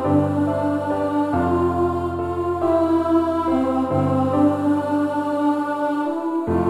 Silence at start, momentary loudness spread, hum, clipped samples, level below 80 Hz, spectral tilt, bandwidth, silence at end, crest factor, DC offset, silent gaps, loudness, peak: 0 s; 5 LU; none; under 0.1%; -46 dBFS; -8.5 dB/octave; 11.5 kHz; 0 s; 14 dB; under 0.1%; none; -20 LUFS; -6 dBFS